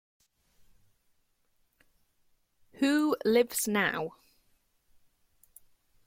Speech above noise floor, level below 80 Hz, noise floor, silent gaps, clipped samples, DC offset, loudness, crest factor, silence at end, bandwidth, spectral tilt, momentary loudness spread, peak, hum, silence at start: 44 dB; -72 dBFS; -72 dBFS; none; under 0.1%; under 0.1%; -28 LUFS; 20 dB; 1.95 s; 16.5 kHz; -3.5 dB/octave; 8 LU; -14 dBFS; none; 2.8 s